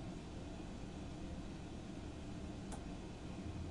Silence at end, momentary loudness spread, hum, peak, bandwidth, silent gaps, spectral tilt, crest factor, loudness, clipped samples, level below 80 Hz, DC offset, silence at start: 0 s; 2 LU; none; -32 dBFS; 11 kHz; none; -6 dB/octave; 16 dB; -49 LUFS; under 0.1%; -54 dBFS; under 0.1%; 0 s